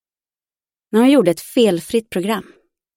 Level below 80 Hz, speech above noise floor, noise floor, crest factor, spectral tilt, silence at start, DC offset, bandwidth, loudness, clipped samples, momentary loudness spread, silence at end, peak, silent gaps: -60 dBFS; over 74 dB; under -90 dBFS; 16 dB; -5.5 dB/octave; 0.95 s; under 0.1%; 17 kHz; -17 LUFS; under 0.1%; 9 LU; 0.55 s; -2 dBFS; none